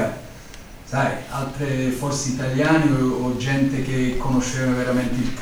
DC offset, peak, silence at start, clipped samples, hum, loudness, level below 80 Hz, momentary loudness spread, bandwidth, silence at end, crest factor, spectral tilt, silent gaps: under 0.1%; -4 dBFS; 0 s; under 0.1%; none; -22 LUFS; -36 dBFS; 11 LU; over 20 kHz; 0 s; 18 dB; -5.5 dB/octave; none